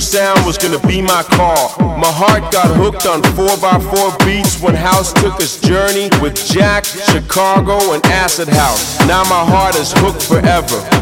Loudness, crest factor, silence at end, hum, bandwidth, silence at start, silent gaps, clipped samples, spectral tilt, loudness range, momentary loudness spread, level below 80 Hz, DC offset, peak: -11 LUFS; 12 dB; 0 s; none; 17.5 kHz; 0 s; none; under 0.1%; -4 dB/octave; 1 LU; 3 LU; -26 dBFS; under 0.1%; 0 dBFS